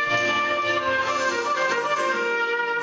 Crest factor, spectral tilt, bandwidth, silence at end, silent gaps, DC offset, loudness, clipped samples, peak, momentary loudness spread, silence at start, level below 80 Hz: 14 dB; -2.5 dB/octave; 8 kHz; 0 s; none; under 0.1%; -22 LUFS; under 0.1%; -10 dBFS; 2 LU; 0 s; -62 dBFS